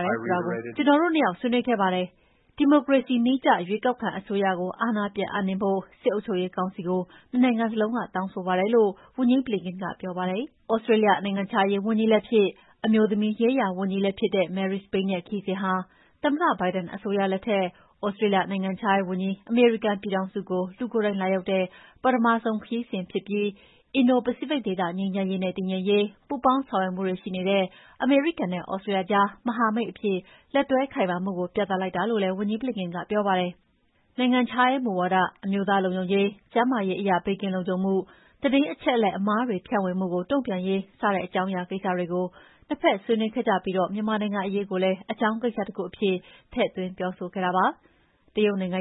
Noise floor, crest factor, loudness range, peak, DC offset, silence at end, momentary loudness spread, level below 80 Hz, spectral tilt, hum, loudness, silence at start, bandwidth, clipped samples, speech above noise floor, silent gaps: -66 dBFS; 18 dB; 3 LU; -6 dBFS; under 0.1%; 0 s; 8 LU; -64 dBFS; -10.5 dB/octave; none; -25 LUFS; 0 s; 4.1 kHz; under 0.1%; 41 dB; none